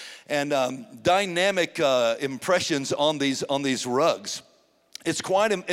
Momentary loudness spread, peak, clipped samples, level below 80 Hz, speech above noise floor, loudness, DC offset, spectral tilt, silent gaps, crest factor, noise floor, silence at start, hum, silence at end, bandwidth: 8 LU; -8 dBFS; under 0.1%; -68 dBFS; 24 dB; -24 LUFS; under 0.1%; -3.5 dB/octave; none; 16 dB; -48 dBFS; 0 s; none; 0 s; 16 kHz